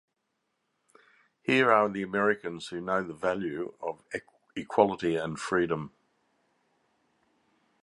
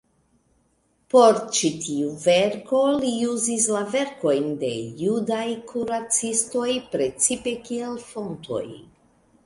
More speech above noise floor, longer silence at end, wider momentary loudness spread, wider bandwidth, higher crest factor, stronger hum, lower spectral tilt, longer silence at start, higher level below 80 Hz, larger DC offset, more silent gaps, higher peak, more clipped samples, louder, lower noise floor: first, 51 dB vs 43 dB; first, 1.95 s vs 0.65 s; first, 15 LU vs 11 LU; about the same, 11.5 kHz vs 11.5 kHz; about the same, 24 dB vs 20 dB; neither; first, -5.5 dB/octave vs -3 dB/octave; first, 1.45 s vs 1.15 s; about the same, -66 dBFS vs -62 dBFS; neither; neither; about the same, -6 dBFS vs -4 dBFS; neither; second, -29 LUFS vs -23 LUFS; first, -80 dBFS vs -66 dBFS